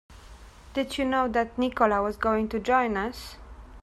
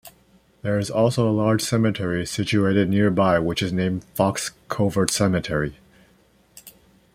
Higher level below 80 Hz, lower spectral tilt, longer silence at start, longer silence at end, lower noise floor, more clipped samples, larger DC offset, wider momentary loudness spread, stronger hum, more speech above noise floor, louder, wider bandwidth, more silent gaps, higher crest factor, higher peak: about the same, -48 dBFS vs -50 dBFS; about the same, -5 dB/octave vs -5.5 dB/octave; about the same, 0.1 s vs 0.05 s; second, 0 s vs 0.45 s; second, -48 dBFS vs -58 dBFS; neither; neither; first, 11 LU vs 7 LU; neither; second, 22 dB vs 37 dB; second, -26 LUFS vs -22 LUFS; second, 14.5 kHz vs 16 kHz; neither; about the same, 20 dB vs 22 dB; second, -8 dBFS vs -2 dBFS